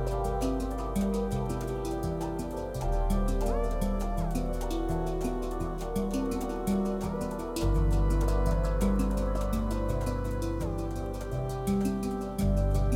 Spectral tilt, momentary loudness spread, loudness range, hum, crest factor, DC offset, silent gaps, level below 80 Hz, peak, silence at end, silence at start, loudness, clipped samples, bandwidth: -7 dB/octave; 6 LU; 3 LU; none; 14 dB; under 0.1%; none; -32 dBFS; -14 dBFS; 0 s; 0 s; -31 LUFS; under 0.1%; 16 kHz